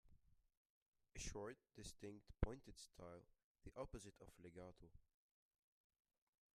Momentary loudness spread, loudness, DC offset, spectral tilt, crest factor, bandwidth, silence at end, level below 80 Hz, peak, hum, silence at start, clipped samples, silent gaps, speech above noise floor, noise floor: 14 LU; -56 LUFS; under 0.1%; -5 dB/octave; 34 dB; 14 kHz; 1.55 s; -60 dBFS; -22 dBFS; none; 0.05 s; under 0.1%; 0.57-0.93 s, 3.43-3.55 s; 19 dB; -73 dBFS